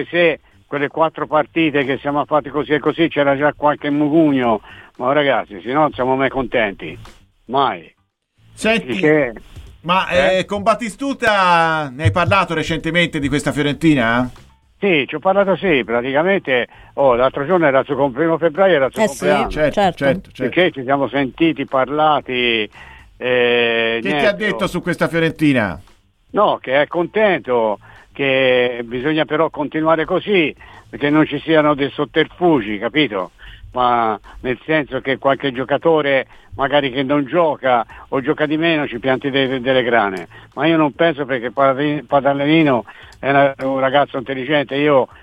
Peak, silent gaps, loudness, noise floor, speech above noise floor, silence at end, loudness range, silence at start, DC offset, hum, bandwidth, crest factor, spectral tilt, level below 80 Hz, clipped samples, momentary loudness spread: -2 dBFS; none; -17 LUFS; -60 dBFS; 43 dB; 0.15 s; 2 LU; 0 s; under 0.1%; none; 13.5 kHz; 16 dB; -6 dB/octave; -46 dBFS; under 0.1%; 7 LU